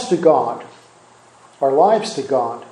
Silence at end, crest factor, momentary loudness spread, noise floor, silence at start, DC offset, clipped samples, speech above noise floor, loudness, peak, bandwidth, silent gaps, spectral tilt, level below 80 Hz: 0.1 s; 18 dB; 9 LU; -48 dBFS; 0 s; under 0.1%; under 0.1%; 32 dB; -17 LUFS; 0 dBFS; 11.5 kHz; none; -5.5 dB/octave; -70 dBFS